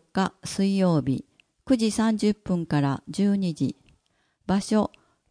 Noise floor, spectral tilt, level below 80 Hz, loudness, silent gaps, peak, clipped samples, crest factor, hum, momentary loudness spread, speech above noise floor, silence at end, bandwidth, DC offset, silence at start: -70 dBFS; -6.5 dB/octave; -56 dBFS; -25 LUFS; none; -10 dBFS; under 0.1%; 16 dB; none; 8 LU; 46 dB; 0.45 s; 10.5 kHz; under 0.1%; 0.15 s